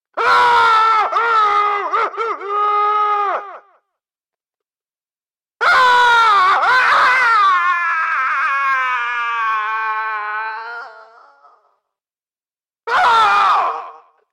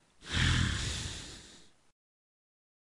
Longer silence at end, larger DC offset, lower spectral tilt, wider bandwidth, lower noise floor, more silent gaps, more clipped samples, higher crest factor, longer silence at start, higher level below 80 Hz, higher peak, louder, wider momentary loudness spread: second, 0.35 s vs 1.25 s; neither; second, -0.5 dB/octave vs -3.5 dB/octave; first, 13 kHz vs 11.5 kHz; first, under -90 dBFS vs -57 dBFS; neither; neither; second, 10 dB vs 20 dB; about the same, 0.15 s vs 0.2 s; second, -60 dBFS vs -46 dBFS; first, -6 dBFS vs -16 dBFS; first, -14 LUFS vs -32 LUFS; second, 11 LU vs 17 LU